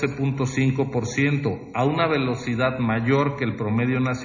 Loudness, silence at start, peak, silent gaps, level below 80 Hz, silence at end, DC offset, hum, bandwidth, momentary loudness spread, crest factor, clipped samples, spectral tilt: -23 LUFS; 0 s; -8 dBFS; none; -50 dBFS; 0 s; under 0.1%; none; 7.4 kHz; 4 LU; 16 dB; under 0.1%; -6.5 dB/octave